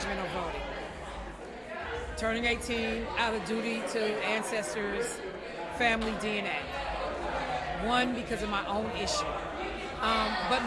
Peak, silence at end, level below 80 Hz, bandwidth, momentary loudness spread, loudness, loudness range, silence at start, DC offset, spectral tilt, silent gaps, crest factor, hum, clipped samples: -14 dBFS; 0 s; -48 dBFS; 12 kHz; 11 LU; -32 LUFS; 2 LU; 0 s; under 0.1%; -3.5 dB/octave; none; 18 dB; none; under 0.1%